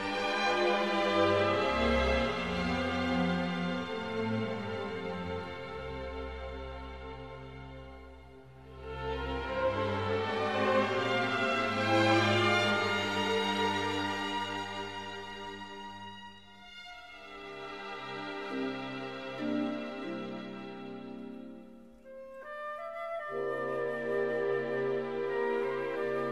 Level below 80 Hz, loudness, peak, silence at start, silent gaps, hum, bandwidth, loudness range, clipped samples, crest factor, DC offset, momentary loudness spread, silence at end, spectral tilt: -50 dBFS; -32 LUFS; -14 dBFS; 0 s; none; none; 13.5 kHz; 14 LU; under 0.1%; 18 dB; 0.1%; 19 LU; 0 s; -5 dB/octave